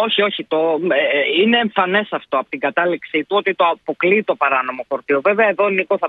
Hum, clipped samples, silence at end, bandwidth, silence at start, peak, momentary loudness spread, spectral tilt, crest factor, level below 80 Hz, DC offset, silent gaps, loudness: none; under 0.1%; 0 s; 4.8 kHz; 0 s; -2 dBFS; 6 LU; -7.5 dB/octave; 16 dB; -68 dBFS; under 0.1%; none; -17 LUFS